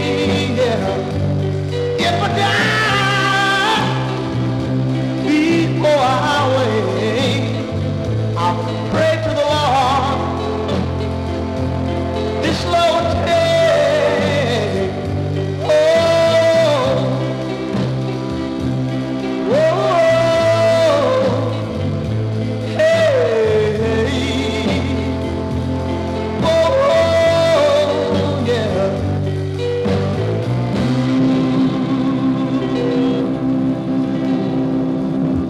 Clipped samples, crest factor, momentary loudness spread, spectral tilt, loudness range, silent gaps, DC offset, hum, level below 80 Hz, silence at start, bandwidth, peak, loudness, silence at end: under 0.1%; 12 dB; 8 LU; -6 dB/octave; 3 LU; none; under 0.1%; none; -38 dBFS; 0 s; 13.5 kHz; -4 dBFS; -16 LUFS; 0 s